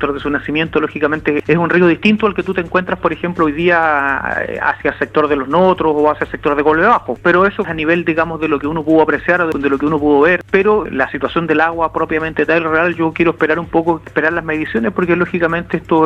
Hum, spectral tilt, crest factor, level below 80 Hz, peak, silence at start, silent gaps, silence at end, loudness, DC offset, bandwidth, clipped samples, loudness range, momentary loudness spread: none; -7.5 dB/octave; 14 dB; -42 dBFS; 0 dBFS; 0 s; none; 0 s; -14 LUFS; under 0.1%; 8.2 kHz; under 0.1%; 2 LU; 6 LU